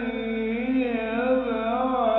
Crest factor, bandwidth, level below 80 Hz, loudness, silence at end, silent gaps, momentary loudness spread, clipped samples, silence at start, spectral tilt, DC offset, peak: 14 dB; 4.2 kHz; -50 dBFS; -25 LUFS; 0 s; none; 4 LU; under 0.1%; 0 s; -8.5 dB/octave; under 0.1%; -10 dBFS